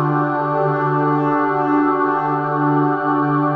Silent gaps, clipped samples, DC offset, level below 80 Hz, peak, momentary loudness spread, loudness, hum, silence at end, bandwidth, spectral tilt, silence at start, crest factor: none; under 0.1%; under 0.1%; -62 dBFS; -6 dBFS; 2 LU; -17 LUFS; none; 0 s; 5 kHz; -10.5 dB/octave; 0 s; 12 dB